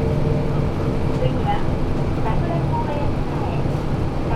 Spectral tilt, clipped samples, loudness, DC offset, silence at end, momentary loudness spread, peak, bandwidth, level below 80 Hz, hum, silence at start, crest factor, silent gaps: -8.5 dB/octave; under 0.1%; -22 LUFS; under 0.1%; 0 s; 3 LU; -6 dBFS; 10.5 kHz; -26 dBFS; none; 0 s; 14 dB; none